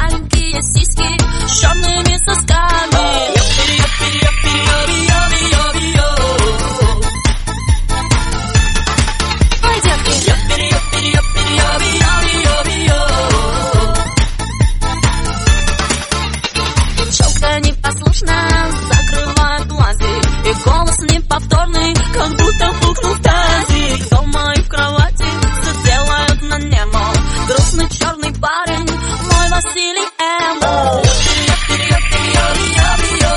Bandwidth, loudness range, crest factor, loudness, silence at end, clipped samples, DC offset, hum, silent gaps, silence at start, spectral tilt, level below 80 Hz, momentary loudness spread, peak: 11.5 kHz; 3 LU; 12 dB; -13 LUFS; 0 s; under 0.1%; under 0.1%; none; none; 0 s; -3.5 dB/octave; -16 dBFS; 4 LU; 0 dBFS